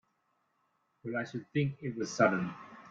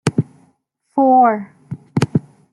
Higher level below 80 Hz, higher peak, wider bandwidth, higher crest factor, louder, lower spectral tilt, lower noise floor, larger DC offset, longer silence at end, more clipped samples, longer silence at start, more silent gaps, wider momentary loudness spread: second, -74 dBFS vs -56 dBFS; second, -12 dBFS vs -2 dBFS; second, 7.8 kHz vs 12 kHz; first, 24 dB vs 16 dB; second, -33 LUFS vs -17 LUFS; second, -6 dB/octave vs -7.5 dB/octave; first, -77 dBFS vs -62 dBFS; neither; second, 0 s vs 0.3 s; neither; first, 1.05 s vs 0.05 s; neither; second, 13 LU vs 19 LU